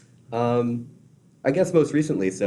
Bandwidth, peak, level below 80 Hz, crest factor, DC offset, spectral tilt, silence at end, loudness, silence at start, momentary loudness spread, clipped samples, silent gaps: 12 kHz; -6 dBFS; -62 dBFS; 18 dB; under 0.1%; -7 dB/octave; 0 s; -23 LUFS; 0.3 s; 9 LU; under 0.1%; none